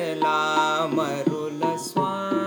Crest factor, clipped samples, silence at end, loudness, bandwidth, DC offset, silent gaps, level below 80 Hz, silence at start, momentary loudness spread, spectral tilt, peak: 16 dB; under 0.1%; 0 s; -24 LUFS; over 20 kHz; under 0.1%; none; -86 dBFS; 0 s; 5 LU; -5 dB/octave; -8 dBFS